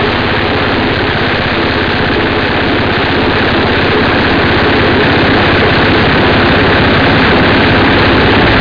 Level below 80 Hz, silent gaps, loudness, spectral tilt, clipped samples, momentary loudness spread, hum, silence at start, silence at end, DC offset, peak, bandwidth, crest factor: -24 dBFS; none; -9 LUFS; -7 dB/octave; under 0.1%; 4 LU; none; 0 s; 0 s; under 0.1%; 0 dBFS; 5.4 kHz; 8 dB